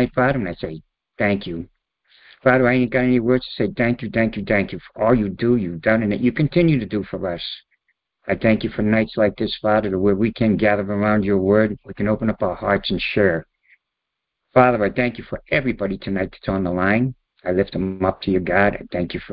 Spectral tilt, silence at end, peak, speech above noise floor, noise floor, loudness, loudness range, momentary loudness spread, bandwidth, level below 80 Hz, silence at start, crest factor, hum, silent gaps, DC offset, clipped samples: -11.5 dB/octave; 0 s; 0 dBFS; 61 dB; -81 dBFS; -20 LUFS; 3 LU; 9 LU; 5.2 kHz; -42 dBFS; 0 s; 20 dB; none; none; under 0.1%; under 0.1%